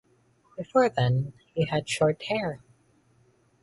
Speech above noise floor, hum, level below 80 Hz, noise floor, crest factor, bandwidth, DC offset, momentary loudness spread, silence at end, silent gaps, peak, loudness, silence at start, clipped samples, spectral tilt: 38 dB; none; -60 dBFS; -64 dBFS; 20 dB; 11.5 kHz; under 0.1%; 16 LU; 1.05 s; none; -8 dBFS; -27 LUFS; 0.6 s; under 0.1%; -6 dB/octave